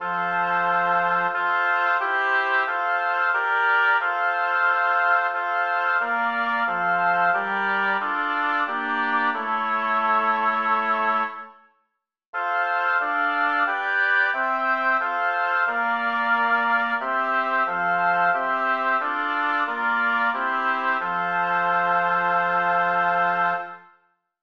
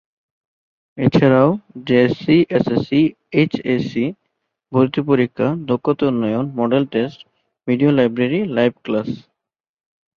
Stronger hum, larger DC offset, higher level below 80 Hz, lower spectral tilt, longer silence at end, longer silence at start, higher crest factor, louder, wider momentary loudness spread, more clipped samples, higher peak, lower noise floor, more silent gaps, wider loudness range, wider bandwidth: neither; first, 0.1% vs under 0.1%; second, -80 dBFS vs -54 dBFS; second, -5 dB/octave vs -8.5 dB/octave; second, 0.65 s vs 1 s; second, 0 s vs 0.95 s; about the same, 14 dB vs 16 dB; second, -22 LUFS vs -18 LUFS; second, 3 LU vs 8 LU; neither; second, -8 dBFS vs -2 dBFS; about the same, -76 dBFS vs -74 dBFS; first, 12.26-12.33 s vs none; about the same, 2 LU vs 3 LU; about the same, 6.8 kHz vs 6.8 kHz